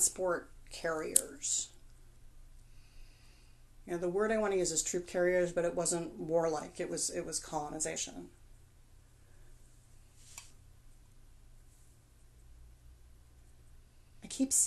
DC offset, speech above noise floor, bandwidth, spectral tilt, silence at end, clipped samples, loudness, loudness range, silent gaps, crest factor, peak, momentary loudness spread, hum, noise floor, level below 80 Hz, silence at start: under 0.1%; 26 dB; 12.5 kHz; -2.5 dB/octave; 0 s; under 0.1%; -34 LUFS; 10 LU; none; 36 dB; -2 dBFS; 21 LU; none; -60 dBFS; -58 dBFS; 0 s